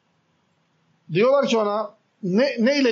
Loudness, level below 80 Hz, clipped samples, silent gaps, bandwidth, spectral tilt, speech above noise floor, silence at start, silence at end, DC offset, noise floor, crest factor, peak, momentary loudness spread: -21 LUFS; -84 dBFS; under 0.1%; none; 7.6 kHz; -4 dB/octave; 47 dB; 1.1 s; 0 s; under 0.1%; -66 dBFS; 14 dB; -10 dBFS; 11 LU